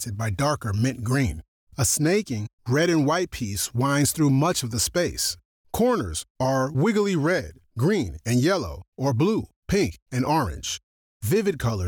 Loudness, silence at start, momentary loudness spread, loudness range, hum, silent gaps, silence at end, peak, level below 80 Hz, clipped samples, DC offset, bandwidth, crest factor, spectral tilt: -24 LUFS; 0 s; 10 LU; 2 LU; none; 1.48-1.67 s, 2.53-2.58 s, 5.45-5.64 s, 6.30-6.35 s, 8.88-8.92 s, 9.56-9.62 s, 10.02-10.06 s, 10.83-11.20 s; 0 s; -12 dBFS; -44 dBFS; under 0.1%; under 0.1%; over 20 kHz; 12 dB; -5 dB/octave